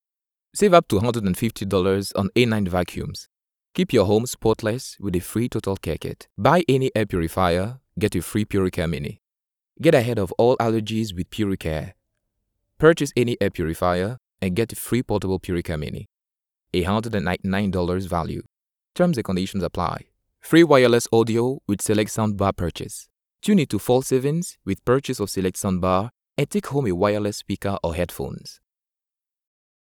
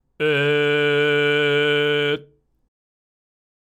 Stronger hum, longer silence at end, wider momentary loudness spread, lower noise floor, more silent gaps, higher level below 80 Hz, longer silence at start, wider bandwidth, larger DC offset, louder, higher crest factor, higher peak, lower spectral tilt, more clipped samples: neither; about the same, 1.45 s vs 1.45 s; first, 12 LU vs 4 LU; first, -89 dBFS vs -50 dBFS; neither; first, -48 dBFS vs -70 dBFS; first, 0.55 s vs 0.2 s; first, over 20 kHz vs 9.2 kHz; neither; second, -22 LUFS vs -19 LUFS; first, 22 dB vs 12 dB; first, 0 dBFS vs -10 dBFS; about the same, -6 dB/octave vs -5.5 dB/octave; neither